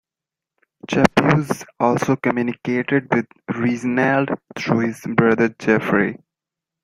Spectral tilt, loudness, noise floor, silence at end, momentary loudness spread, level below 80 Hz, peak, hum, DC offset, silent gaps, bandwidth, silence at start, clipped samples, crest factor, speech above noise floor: -6.5 dB/octave; -19 LUFS; -88 dBFS; 0.7 s; 8 LU; -52 dBFS; 0 dBFS; none; under 0.1%; none; 15.5 kHz; 0.85 s; under 0.1%; 20 dB; 69 dB